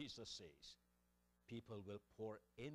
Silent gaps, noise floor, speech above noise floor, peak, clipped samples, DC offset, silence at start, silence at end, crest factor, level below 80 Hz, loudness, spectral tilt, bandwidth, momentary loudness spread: none; -82 dBFS; 26 dB; -40 dBFS; under 0.1%; under 0.1%; 0 s; 0 s; 16 dB; -78 dBFS; -56 LUFS; -4.5 dB/octave; 15 kHz; 9 LU